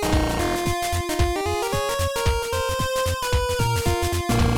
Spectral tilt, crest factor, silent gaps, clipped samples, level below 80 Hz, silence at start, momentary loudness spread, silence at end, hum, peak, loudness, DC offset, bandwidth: -4.5 dB/octave; 14 dB; none; under 0.1%; -30 dBFS; 0 s; 2 LU; 0 s; none; -8 dBFS; -23 LUFS; under 0.1%; 19 kHz